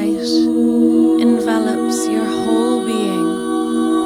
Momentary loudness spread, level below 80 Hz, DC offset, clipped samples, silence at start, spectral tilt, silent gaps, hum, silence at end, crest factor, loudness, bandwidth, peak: 5 LU; -54 dBFS; under 0.1%; under 0.1%; 0 s; -4.5 dB/octave; none; none; 0 s; 12 dB; -16 LUFS; 14 kHz; -4 dBFS